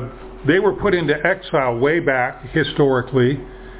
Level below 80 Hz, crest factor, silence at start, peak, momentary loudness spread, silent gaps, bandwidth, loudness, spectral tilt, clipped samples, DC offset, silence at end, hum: -42 dBFS; 16 dB; 0 s; -2 dBFS; 4 LU; none; 4 kHz; -18 LUFS; -10.5 dB/octave; under 0.1%; under 0.1%; 0 s; none